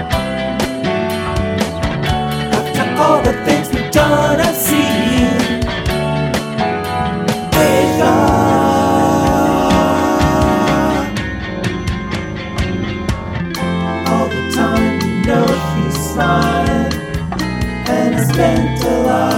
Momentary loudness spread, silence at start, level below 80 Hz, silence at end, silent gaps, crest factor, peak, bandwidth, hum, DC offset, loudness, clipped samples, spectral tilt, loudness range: 8 LU; 0 s; -28 dBFS; 0 s; none; 14 dB; 0 dBFS; 17 kHz; none; under 0.1%; -15 LUFS; under 0.1%; -5.5 dB/octave; 5 LU